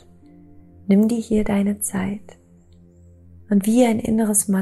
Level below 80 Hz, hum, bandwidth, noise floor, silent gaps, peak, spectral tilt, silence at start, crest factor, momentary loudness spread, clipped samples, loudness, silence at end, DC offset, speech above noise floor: -46 dBFS; none; 14 kHz; -50 dBFS; none; -4 dBFS; -5.5 dB/octave; 0.85 s; 18 dB; 10 LU; under 0.1%; -19 LUFS; 0 s; under 0.1%; 31 dB